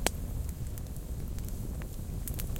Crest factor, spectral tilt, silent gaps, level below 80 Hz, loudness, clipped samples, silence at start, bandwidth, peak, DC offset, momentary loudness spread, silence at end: 30 dB; -4.5 dB/octave; none; -38 dBFS; -39 LUFS; under 0.1%; 0 s; 17 kHz; -4 dBFS; under 0.1%; 3 LU; 0 s